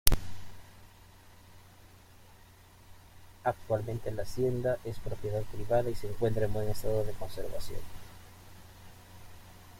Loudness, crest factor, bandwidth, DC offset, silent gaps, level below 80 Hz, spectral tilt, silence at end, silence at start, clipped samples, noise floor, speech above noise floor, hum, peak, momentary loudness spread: -34 LUFS; 30 dB; 16.5 kHz; under 0.1%; none; -42 dBFS; -5 dB/octave; 0 s; 0.05 s; under 0.1%; -56 dBFS; 26 dB; none; -2 dBFS; 26 LU